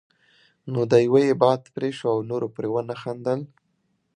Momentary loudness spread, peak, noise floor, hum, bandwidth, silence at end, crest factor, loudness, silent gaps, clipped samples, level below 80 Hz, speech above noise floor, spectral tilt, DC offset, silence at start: 13 LU; -2 dBFS; -71 dBFS; none; 10 kHz; 0.7 s; 22 dB; -23 LUFS; none; under 0.1%; -70 dBFS; 49 dB; -7 dB/octave; under 0.1%; 0.65 s